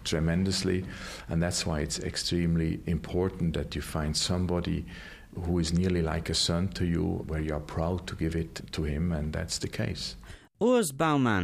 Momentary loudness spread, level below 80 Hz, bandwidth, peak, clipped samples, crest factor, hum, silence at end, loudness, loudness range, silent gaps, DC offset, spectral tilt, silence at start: 9 LU; -42 dBFS; 15.5 kHz; -14 dBFS; under 0.1%; 16 dB; none; 0 s; -30 LUFS; 2 LU; none; under 0.1%; -5 dB/octave; 0 s